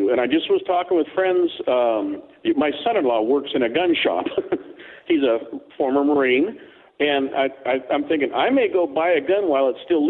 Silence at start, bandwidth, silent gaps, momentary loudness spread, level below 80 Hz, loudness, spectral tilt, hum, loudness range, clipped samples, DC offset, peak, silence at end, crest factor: 0 s; 4.2 kHz; none; 7 LU; -64 dBFS; -20 LUFS; -8 dB/octave; none; 1 LU; under 0.1%; under 0.1%; -6 dBFS; 0 s; 14 dB